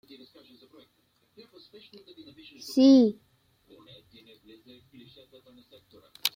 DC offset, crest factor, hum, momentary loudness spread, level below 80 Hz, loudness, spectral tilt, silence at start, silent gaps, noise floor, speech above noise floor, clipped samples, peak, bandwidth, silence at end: under 0.1%; 24 dB; none; 31 LU; -76 dBFS; -22 LUFS; -4.5 dB/octave; 2.65 s; none; -70 dBFS; 45 dB; under 0.1%; -6 dBFS; 16.5 kHz; 0.1 s